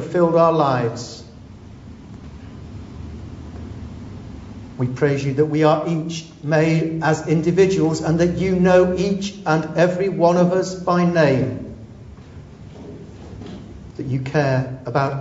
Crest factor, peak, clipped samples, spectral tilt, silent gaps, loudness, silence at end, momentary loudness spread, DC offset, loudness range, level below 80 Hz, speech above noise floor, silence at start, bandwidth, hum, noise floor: 18 dB; -2 dBFS; under 0.1%; -7 dB/octave; none; -18 LUFS; 0 s; 23 LU; under 0.1%; 14 LU; -44 dBFS; 22 dB; 0 s; 8 kHz; none; -39 dBFS